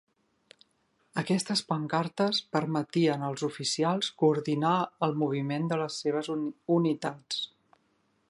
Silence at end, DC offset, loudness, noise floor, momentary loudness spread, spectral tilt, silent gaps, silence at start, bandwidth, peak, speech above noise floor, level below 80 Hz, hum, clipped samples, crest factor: 0.85 s; under 0.1%; -29 LUFS; -72 dBFS; 7 LU; -5 dB/octave; none; 1.15 s; 11.5 kHz; -12 dBFS; 43 dB; -76 dBFS; none; under 0.1%; 18 dB